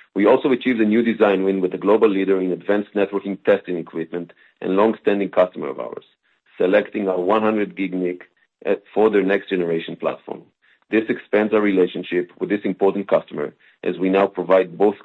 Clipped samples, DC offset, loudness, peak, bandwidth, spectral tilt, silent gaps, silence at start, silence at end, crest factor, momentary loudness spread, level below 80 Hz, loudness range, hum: under 0.1%; under 0.1%; -20 LUFS; -2 dBFS; 4.3 kHz; -8.5 dB/octave; none; 0.15 s; 0.1 s; 18 dB; 13 LU; -68 dBFS; 3 LU; none